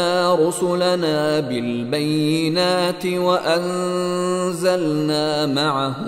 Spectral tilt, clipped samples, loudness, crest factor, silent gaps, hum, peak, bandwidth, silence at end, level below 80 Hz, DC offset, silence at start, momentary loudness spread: -5 dB/octave; under 0.1%; -19 LUFS; 14 dB; none; none; -6 dBFS; 16 kHz; 0 s; -62 dBFS; under 0.1%; 0 s; 4 LU